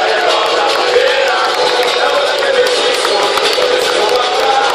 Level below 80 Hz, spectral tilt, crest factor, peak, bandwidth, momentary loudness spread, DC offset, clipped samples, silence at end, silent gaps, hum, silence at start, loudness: -52 dBFS; -0.5 dB/octave; 12 dB; 0 dBFS; 15.5 kHz; 1 LU; under 0.1%; under 0.1%; 0 s; none; none; 0 s; -11 LUFS